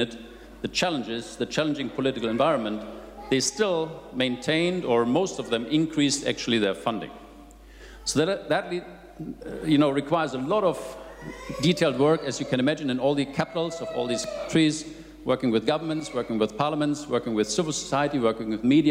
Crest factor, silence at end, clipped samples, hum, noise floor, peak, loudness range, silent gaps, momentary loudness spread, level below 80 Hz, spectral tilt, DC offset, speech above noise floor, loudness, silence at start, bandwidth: 16 dB; 0 s; under 0.1%; none; -47 dBFS; -10 dBFS; 2 LU; none; 13 LU; -54 dBFS; -4.5 dB/octave; under 0.1%; 22 dB; -26 LUFS; 0 s; 15.5 kHz